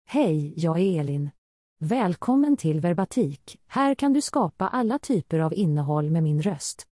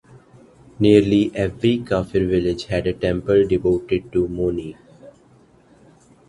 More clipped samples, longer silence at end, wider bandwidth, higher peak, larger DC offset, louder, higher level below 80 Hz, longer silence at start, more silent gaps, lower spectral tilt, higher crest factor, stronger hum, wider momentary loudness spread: neither; second, 0.1 s vs 1.2 s; about the same, 12 kHz vs 11.5 kHz; second, -10 dBFS vs 0 dBFS; neither; second, -24 LUFS vs -19 LUFS; second, -64 dBFS vs -42 dBFS; second, 0.1 s vs 0.8 s; first, 1.38-1.76 s vs none; about the same, -7 dB/octave vs -7.5 dB/octave; second, 14 dB vs 20 dB; neither; about the same, 7 LU vs 8 LU